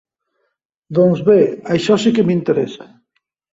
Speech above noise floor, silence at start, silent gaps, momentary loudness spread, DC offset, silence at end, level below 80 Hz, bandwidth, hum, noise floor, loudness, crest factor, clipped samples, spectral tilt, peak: 56 dB; 0.9 s; none; 9 LU; under 0.1%; 0.7 s; -56 dBFS; 8 kHz; none; -71 dBFS; -15 LUFS; 16 dB; under 0.1%; -7 dB/octave; 0 dBFS